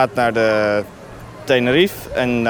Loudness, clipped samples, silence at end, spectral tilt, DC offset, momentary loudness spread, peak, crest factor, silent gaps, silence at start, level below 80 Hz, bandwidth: -17 LUFS; under 0.1%; 0 s; -5.5 dB/octave; under 0.1%; 18 LU; -2 dBFS; 16 dB; none; 0 s; -44 dBFS; over 20 kHz